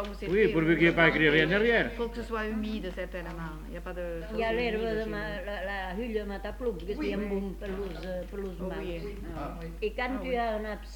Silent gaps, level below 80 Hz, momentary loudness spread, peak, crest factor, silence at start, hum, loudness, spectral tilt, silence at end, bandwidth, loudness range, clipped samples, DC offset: none; -42 dBFS; 15 LU; -8 dBFS; 22 dB; 0 s; none; -30 LUFS; -6.5 dB/octave; 0 s; 19 kHz; 9 LU; under 0.1%; under 0.1%